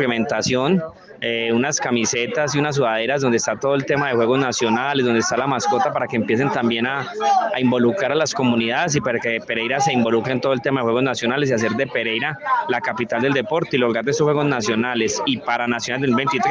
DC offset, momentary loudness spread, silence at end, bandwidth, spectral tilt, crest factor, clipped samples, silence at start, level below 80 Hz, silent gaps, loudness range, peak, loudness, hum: under 0.1%; 4 LU; 0 s; 10 kHz; -4.5 dB/octave; 14 dB; under 0.1%; 0 s; -60 dBFS; none; 1 LU; -6 dBFS; -19 LUFS; none